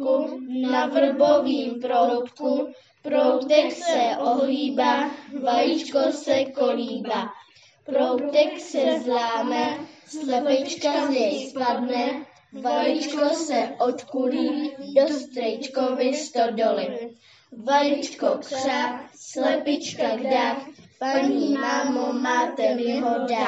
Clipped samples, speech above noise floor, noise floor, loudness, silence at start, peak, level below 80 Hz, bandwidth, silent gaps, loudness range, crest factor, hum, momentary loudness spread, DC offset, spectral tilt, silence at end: under 0.1%; 29 dB; -52 dBFS; -23 LUFS; 0 s; -4 dBFS; -84 dBFS; 8.2 kHz; none; 3 LU; 18 dB; none; 8 LU; under 0.1%; -3.5 dB/octave; 0 s